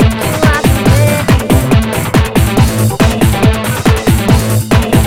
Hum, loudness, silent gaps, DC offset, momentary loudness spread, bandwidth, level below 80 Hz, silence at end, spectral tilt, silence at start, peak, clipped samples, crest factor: none; -10 LUFS; none; 0.4%; 2 LU; 17 kHz; -18 dBFS; 0 s; -5.5 dB/octave; 0 s; 0 dBFS; 0.5%; 10 dB